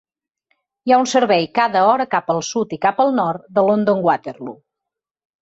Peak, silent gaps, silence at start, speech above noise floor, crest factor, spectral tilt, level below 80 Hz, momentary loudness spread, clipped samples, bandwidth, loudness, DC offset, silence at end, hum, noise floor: -2 dBFS; none; 0.85 s; 67 dB; 16 dB; -4.5 dB/octave; -64 dBFS; 8 LU; under 0.1%; 8 kHz; -17 LUFS; under 0.1%; 0.9 s; none; -84 dBFS